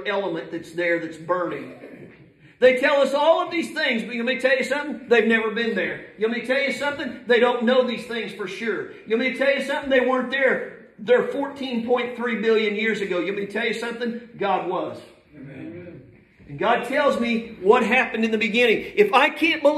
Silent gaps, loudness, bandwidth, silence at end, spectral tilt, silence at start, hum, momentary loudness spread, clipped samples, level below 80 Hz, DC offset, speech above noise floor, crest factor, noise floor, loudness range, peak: none; -22 LUFS; 13.5 kHz; 0 s; -4.5 dB/octave; 0 s; none; 12 LU; under 0.1%; -64 dBFS; under 0.1%; 28 dB; 20 dB; -50 dBFS; 6 LU; -2 dBFS